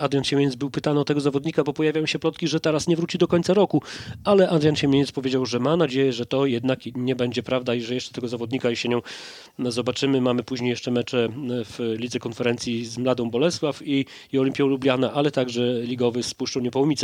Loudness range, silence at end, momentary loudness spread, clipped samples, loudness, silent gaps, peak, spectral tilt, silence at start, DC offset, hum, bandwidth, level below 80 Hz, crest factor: 4 LU; 0 s; 8 LU; under 0.1%; -23 LUFS; none; -4 dBFS; -5.5 dB/octave; 0 s; under 0.1%; none; 12.5 kHz; -60 dBFS; 18 dB